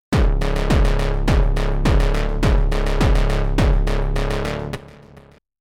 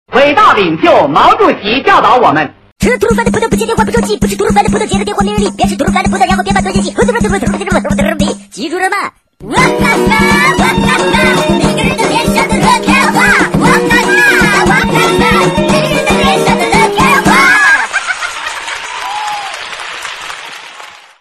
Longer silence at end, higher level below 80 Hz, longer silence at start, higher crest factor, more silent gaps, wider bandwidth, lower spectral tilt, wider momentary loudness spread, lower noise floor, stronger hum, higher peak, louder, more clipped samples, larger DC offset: first, 0.7 s vs 0.25 s; first, -18 dBFS vs -28 dBFS; about the same, 0.1 s vs 0.1 s; about the same, 12 dB vs 10 dB; second, none vs 2.72-2.76 s; second, 12 kHz vs 14 kHz; first, -6.5 dB/octave vs -4.5 dB/octave; second, 5 LU vs 12 LU; first, -47 dBFS vs -32 dBFS; neither; second, -6 dBFS vs 0 dBFS; second, -20 LUFS vs -9 LUFS; neither; neither